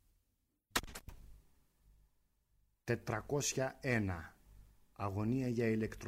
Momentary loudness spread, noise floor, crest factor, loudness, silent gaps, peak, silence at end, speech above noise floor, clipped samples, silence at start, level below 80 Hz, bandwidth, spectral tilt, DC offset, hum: 17 LU; -82 dBFS; 22 dB; -38 LUFS; none; -20 dBFS; 0 s; 45 dB; under 0.1%; 0.75 s; -60 dBFS; 16 kHz; -5 dB/octave; under 0.1%; none